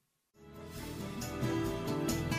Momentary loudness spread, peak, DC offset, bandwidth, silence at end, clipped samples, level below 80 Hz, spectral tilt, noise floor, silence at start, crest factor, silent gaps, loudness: 15 LU; -22 dBFS; under 0.1%; 15.5 kHz; 0 s; under 0.1%; -52 dBFS; -5.5 dB/octave; -61 dBFS; 0.4 s; 16 dB; none; -37 LUFS